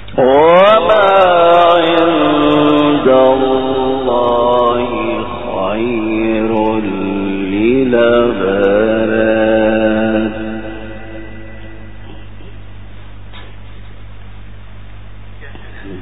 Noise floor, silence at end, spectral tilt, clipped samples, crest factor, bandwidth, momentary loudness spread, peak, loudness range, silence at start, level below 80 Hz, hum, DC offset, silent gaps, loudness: -33 dBFS; 0 s; -8 dB/octave; under 0.1%; 14 dB; 4 kHz; 20 LU; 0 dBFS; 14 LU; 0 s; -36 dBFS; 50 Hz at -35 dBFS; 3%; none; -12 LUFS